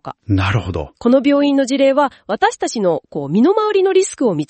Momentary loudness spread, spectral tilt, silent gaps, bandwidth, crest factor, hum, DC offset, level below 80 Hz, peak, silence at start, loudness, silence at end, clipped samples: 6 LU; -5.5 dB/octave; none; 8.8 kHz; 14 dB; none; under 0.1%; -44 dBFS; -2 dBFS; 0.05 s; -16 LUFS; 0.05 s; under 0.1%